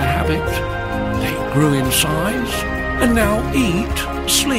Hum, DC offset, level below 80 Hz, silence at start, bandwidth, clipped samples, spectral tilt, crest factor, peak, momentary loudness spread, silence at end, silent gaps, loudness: none; under 0.1%; -28 dBFS; 0 s; 16 kHz; under 0.1%; -4 dB/octave; 16 dB; -2 dBFS; 6 LU; 0 s; none; -18 LUFS